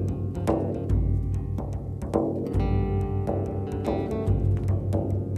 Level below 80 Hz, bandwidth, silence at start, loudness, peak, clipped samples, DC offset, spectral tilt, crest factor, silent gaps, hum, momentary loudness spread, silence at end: -34 dBFS; 9.2 kHz; 0 s; -27 LUFS; -8 dBFS; under 0.1%; under 0.1%; -9.5 dB/octave; 16 dB; none; none; 5 LU; 0 s